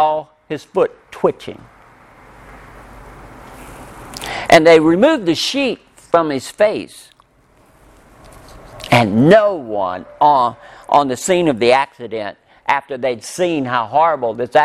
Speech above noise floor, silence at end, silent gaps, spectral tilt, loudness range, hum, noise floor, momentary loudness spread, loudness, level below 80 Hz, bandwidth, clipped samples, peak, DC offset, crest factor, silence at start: 37 dB; 0 s; none; -5 dB/octave; 10 LU; none; -52 dBFS; 20 LU; -15 LUFS; -50 dBFS; 15 kHz; under 0.1%; 0 dBFS; under 0.1%; 16 dB; 0 s